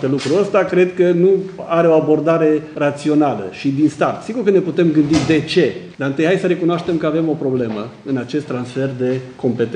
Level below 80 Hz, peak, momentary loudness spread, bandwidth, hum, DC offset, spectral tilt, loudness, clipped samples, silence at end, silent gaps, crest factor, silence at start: -52 dBFS; 0 dBFS; 8 LU; 10 kHz; none; under 0.1%; -7 dB/octave; -17 LUFS; under 0.1%; 0 s; none; 16 dB; 0 s